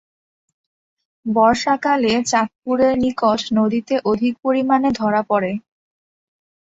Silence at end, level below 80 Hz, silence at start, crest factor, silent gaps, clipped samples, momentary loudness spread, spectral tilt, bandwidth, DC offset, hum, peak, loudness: 1.1 s; -52 dBFS; 1.25 s; 18 dB; 2.56-2.62 s; under 0.1%; 5 LU; -4.5 dB/octave; 8 kHz; under 0.1%; none; -2 dBFS; -18 LUFS